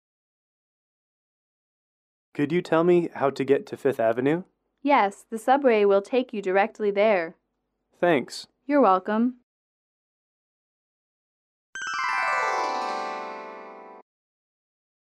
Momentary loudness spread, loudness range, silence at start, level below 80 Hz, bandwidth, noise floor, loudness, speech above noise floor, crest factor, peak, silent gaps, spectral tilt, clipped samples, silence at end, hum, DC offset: 16 LU; 6 LU; 2.35 s; -76 dBFS; 13 kHz; -78 dBFS; -24 LUFS; 55 dB; 18 dB; -8 dBFS; 9.43-11.73 s; -6 dB/octave; under 0.1%; 1.1 s; none; under 0.1%